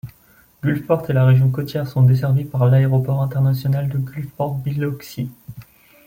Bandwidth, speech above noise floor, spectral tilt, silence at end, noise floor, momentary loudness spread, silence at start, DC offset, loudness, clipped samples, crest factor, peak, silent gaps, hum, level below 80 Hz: 16 kHz; 35 dB; -9 dB/octave; 0.45 s; -53 dBFS; 14 LU; 0.05 s; under 0.1%; -19 LUFS; under 0.1%; 14 dB; -4 dBFS; none; none; -52 dBFS